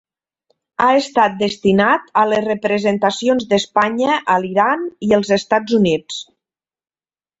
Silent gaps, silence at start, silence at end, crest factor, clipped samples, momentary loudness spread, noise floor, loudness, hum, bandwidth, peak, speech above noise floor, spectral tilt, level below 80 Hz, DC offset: none; 0.8 s; 1.15 s; 16 dB; under 0.1%; 4 LU; under -90 dBFS; -16 LUFS; none; 8 kHz; -2 dBFS; over 74 dB; -5 dB/octave; -56 dBFS; under 0.1%